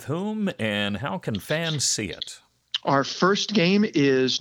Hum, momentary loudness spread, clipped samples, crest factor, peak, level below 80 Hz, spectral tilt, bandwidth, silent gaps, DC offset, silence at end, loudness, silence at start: none; 10 LU; under 0.1%; 18 dB; -6 dBFS; -62 dBFS; -4 dB/octave; 18 kHz; none; under 0.1%; 0 s; -23 LUFS; 0 s